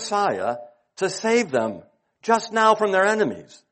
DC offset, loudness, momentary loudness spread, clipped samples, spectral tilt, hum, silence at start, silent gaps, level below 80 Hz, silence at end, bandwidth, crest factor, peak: under 0.1%; -21 LUFS; 14 LU; under 0.1%; -3.5 dB/octave; none; 0 s; none; -70 dBFS; 0.3 s; 8.8 kHz; 18 dB; -4 dBFS